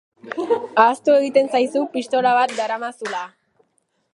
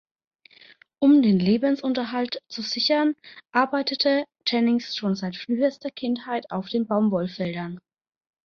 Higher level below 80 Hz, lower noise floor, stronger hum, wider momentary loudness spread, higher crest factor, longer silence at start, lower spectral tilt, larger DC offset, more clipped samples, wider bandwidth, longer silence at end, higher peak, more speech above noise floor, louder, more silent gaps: second, -78 dBFS vs -66 dBFS; first, -68 dBFS vs -53 dBFS; neither; first, 13 LU vs 10 LU; about the same, 18 dB vs 18 dB; second, 0.25 s vs 1 s; second, -3.5 dB/octave vs -6 dB/octave; neither; neither; first, 11.5 kHz vs 6.8 kHz; first, 0.85 s vs 0.65 s; first, -2 dBFS vs -6 dBFS; first, 49 dB vs 30 dB; first, -19 LUFS vs -24 LUFS; neither